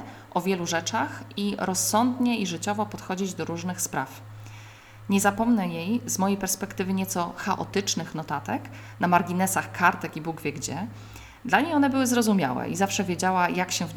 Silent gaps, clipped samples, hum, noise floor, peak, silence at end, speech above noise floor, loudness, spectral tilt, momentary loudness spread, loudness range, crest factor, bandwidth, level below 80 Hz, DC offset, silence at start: none; under 0.1%; none; -46 dBFS; -4 dBFS; 0 s; 20 dB; -26 LUFS; -4 dB/octave; 11 LU; 3 LU; 22 dB; 19.5 kHz; -58 dBFS; under 0.1%; 0 s